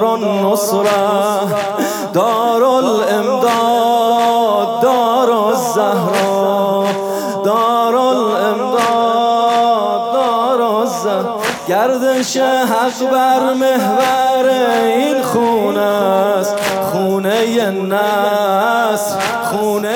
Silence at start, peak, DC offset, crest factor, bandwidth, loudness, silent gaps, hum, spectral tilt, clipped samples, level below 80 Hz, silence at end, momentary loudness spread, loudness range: 0 s; -4 dBFS; under 0.1%; 10 dB; 19 kHz; -14 LUFS; none; none; -4 dB/octave; under 0.1%; -62 dBFS; 0 s; 4 LU; 1 LU